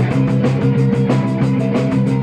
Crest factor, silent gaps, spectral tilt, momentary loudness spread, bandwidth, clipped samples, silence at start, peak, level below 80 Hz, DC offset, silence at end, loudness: 12 dB; none; -9 dB/octave; 2 LU; 9 kHz; under 0.1%; 0 s; -2 dBFS; -44 dBFS; under 0.1%; 0 s; -16 LUFS